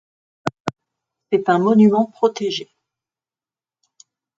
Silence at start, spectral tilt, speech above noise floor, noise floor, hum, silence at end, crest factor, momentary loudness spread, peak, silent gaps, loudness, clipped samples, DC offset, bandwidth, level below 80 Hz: 0.45 s; -6.5 dB/octave; over 74 dB; under -90 dBFS; none; 1.75 s; 20 dB; 16 LU; 0 dBFS; 0.60-0.65 s; -18 LUFS; under 0.1%; under 0.1%; 7.6 kHz; -66 dBFS